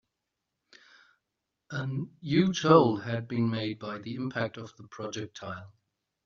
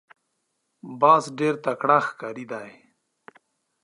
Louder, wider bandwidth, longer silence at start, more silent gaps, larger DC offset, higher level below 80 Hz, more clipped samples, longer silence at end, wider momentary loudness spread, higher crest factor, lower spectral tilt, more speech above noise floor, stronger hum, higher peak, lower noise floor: second, -29 LUFS vs -21 LUFS; second, 7.4 kHz vs 11 kHz; first, 1.7 s vs 0.85 s; neither; neither; first, -68 dBFS vs -82 dBFS; neither; second, 0.55 s vs 1.15 s; about the same, 19 LU vs 18 LU; about the same, 26 dB vs 22 dB; about the same, -5.5 dB/octave vs -5.5 dB/octave; about the same, 56 dB vs 53 dB; neither; about the same, -6 dBFS vs -4 dBFS; first, -85 dBFS vs -75 dBFS